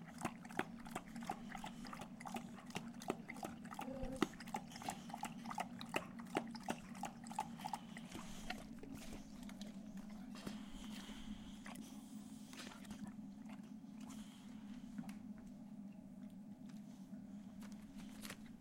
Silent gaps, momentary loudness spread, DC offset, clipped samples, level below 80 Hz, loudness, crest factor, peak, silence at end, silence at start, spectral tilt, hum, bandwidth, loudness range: none; 9 LU; under 0.1%; under 0.1%; -64 dBFS; -50 LUFS; 30 dB; -20 dBFS; 0 s; 0 s; -4.5 dB/octave; none; 16.5 kHz; 7 LU